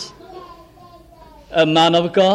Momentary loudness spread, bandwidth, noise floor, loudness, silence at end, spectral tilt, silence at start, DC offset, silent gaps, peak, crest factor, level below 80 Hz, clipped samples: 25 LU; 12 kHz; -44 dBFS; -15 LUFS; 0 s; -5 dB/octave; 0 s; under 0.1%; none; -4 dBFS; 14 dB; -52 dBFS; under 0.1%